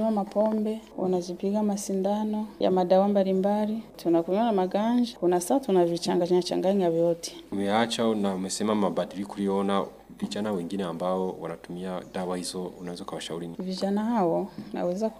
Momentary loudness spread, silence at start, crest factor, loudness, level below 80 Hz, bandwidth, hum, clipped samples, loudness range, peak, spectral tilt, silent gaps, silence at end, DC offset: 11 LU; 0 s; 18 dB; -27 LUFS; -64 dBFS; 15.5 kHz; none; under 0.1%; 7 LU; -8 dBFS; -6 dB/octave; none; 0 s; under 0.1%